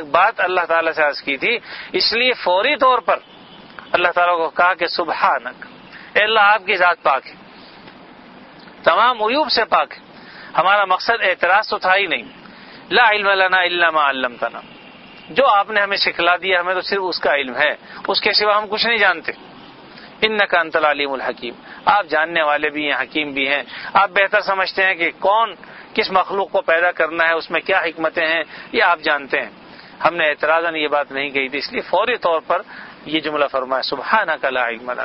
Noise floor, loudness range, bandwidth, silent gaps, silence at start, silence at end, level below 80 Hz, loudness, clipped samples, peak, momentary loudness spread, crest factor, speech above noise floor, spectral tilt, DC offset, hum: -41 dBFS; 3 LU; 6 kHz; none; 0 s; 0 s; -58 dBFS; -17 LUFS; under 0.1%; 0 dBFS; 8 LU; 18 dB; 24 dB; -5.5 dB/octave; under 0.1%; none